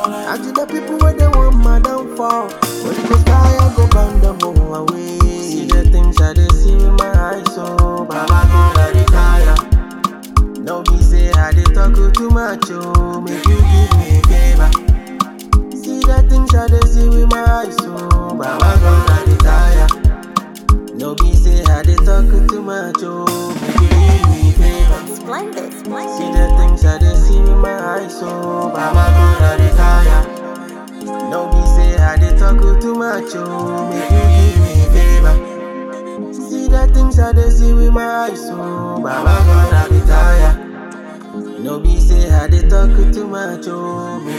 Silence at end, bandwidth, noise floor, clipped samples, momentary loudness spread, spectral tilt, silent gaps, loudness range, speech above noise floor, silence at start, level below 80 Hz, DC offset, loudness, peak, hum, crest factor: 0 s; 14 kHz; -30 dBFS; under 0.1%; 12 LU; -6.5 dB/octave; none; 2 LU; 20 dB; 0 s; -12 dBFS; under 0.1%; -13 LUFS; 0 dBFS; none; 10 dB